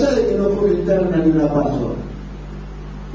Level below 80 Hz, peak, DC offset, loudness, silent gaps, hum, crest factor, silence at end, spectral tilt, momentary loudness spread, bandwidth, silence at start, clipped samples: -32 dBFS; -6 dBFS; under 0.1%; -18 LUFS; none; 50 Hz at -30 dBFS; 12 dB; 0 s; -8 dB/octave; 17 LU; 7.6 kHz; 0 s; under 0.1%